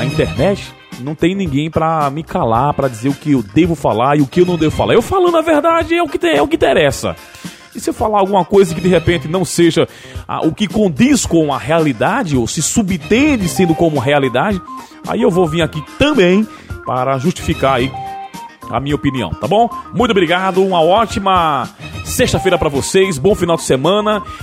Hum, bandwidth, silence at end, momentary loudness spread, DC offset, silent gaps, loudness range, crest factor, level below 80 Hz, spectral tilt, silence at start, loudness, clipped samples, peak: none; 16 kHz; 0 s; 11 LU; under 0.1%; none; 3 LU; 14 dB; -36 dBFS; -5 dB/octave; 0 s; -14 LUFS; under 0.1%; 0 dBFS